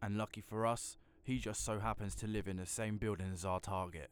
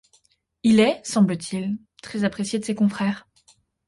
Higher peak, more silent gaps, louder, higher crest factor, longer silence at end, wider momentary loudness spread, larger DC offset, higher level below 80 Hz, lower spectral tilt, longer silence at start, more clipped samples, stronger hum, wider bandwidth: second, -24 dBFS vs -6 dBFS; neither; second, -41 LUFS vs -23 LUFS; about the same, 16 dB vs 16 dB; second, 0.05 s vs 0.7 s; second, 5 LU vs 13 LU; neither; about the same, -56 dBFS vs -60 dBFS; about the same, -5 dB/octave vs -5.5 dB/octave; second, 0 s vs 0.65 s; neither; neither; first, over 20 kHz vs 11.5 kHz